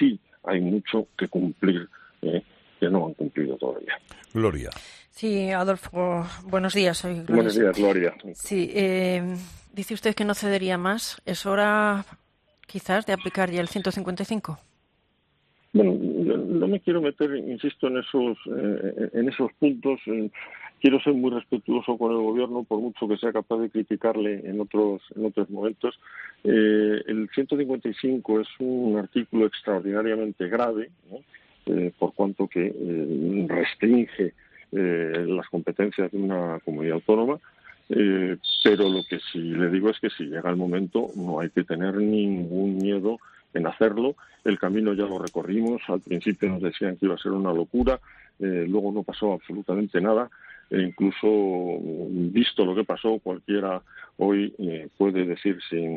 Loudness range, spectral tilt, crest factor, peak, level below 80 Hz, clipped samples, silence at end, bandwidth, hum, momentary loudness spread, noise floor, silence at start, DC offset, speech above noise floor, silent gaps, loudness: 3 LU; -6 dB/octave; 20 dB; -4 dBFS; -54 dBFS; under 0.1%; 0 s; 13 kHz; none; 9 LU; -69 dBFS; 0 s; under 0.1%; 44 dB; none; -25 LUFS